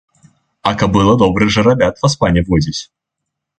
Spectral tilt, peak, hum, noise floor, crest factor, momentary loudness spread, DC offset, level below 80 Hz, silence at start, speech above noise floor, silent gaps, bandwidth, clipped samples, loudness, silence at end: -6 dB/octave; 0 dBFS; none; -78 dBFS; 14 dB; 8 LU; under 0.1%; -32 dBFS; 0.65 s; 65 dB; none; 9 kHz; under 0.1%; -13 LUFS; 0.75 s